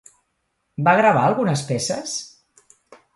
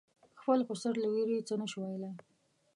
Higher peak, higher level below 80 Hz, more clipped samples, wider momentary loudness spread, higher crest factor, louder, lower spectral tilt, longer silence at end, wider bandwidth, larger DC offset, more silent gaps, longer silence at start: first, -4 dBFS vs -18 dBFS; first, -62 dBFS vs -88 dBFS; neither; first, 16 LU vs 11 LU; about the same, 18 dB vs 18 dB; first, -19 LUFS vs -35 LUFS; second, -4.5 dB/octave vs -6 dB/octave; first, 0.9 s vs 0.55 s; about the same, 11.5 kHz vs 11.5 kHz; neither; neither; first, 0.8 s vs 0.35 s